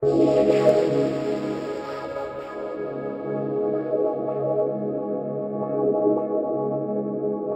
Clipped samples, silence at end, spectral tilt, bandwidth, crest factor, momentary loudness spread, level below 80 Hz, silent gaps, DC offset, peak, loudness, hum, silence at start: under 0.1%; 0 s; -8 dB/octave; 8.6 kHz; 20 dB; 12 LU; -60 dBFS; none; under 0.1%; -4 dBFS; -24 LUFS; none; 0 s